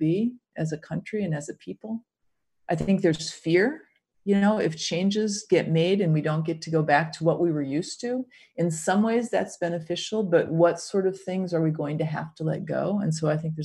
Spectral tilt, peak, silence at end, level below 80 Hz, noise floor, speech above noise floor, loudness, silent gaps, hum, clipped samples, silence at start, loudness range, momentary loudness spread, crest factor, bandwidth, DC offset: -6 dB/octave; -8 dBFS; 0 s; -64 dBFS; -77 dBFS; 52 dB; -26 LUFS; none; none; under 0.1%; 0 s; 4 LU; 10 LU; 18 dB; 11.5 kHz; under 0.1%